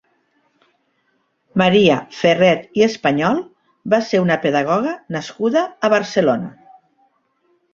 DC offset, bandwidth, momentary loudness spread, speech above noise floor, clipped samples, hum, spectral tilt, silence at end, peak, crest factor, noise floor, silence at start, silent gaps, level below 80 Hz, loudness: under 0.1%; 7.6 kHz; 10 LU; 49 dB; under 0.1%; none; -6 dB/octave; 1.25 s; 0 dBFS; 18 dB; -66 dBFS; 1.55 s; none; -60 dBFS; -17 LUFS